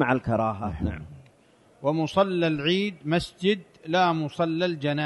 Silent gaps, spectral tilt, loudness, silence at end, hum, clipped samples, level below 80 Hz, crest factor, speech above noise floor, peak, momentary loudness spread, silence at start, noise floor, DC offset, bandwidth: none; -6.5 dB/octave; -26 LUFS; 0 s; none; under 0.1%; -48 dBFS; 18 dB; 33 dB; -8 dBFS; 8 LU; 0 s; -58 dBFS; under 0.1%; 11.5 kHz